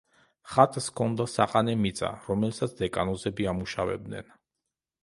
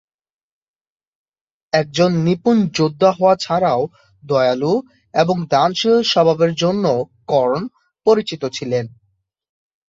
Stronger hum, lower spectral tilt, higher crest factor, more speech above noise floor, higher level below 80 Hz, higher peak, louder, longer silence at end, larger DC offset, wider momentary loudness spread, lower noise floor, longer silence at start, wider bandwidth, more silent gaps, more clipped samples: neither; about the same, -5.5 dB/octave vs -6 dB/octave; first, 26 dB vs 18 dB; first, 59 dB vs 50 dB; first, -52 dBFS vs -58 dBFS; second, -4 dBFS vs 0 dBFS; second, -28 LUFS vs -17 LUFS; second, 0.8 s vs 1 s; neither; about the same, 9 LU vs 8 LU; first, -86 dBFS vs -66 dBFS; second, 0.45 s vs 1.75 s; first, 11.5 kHz vs 7.8 kHz; neither; neither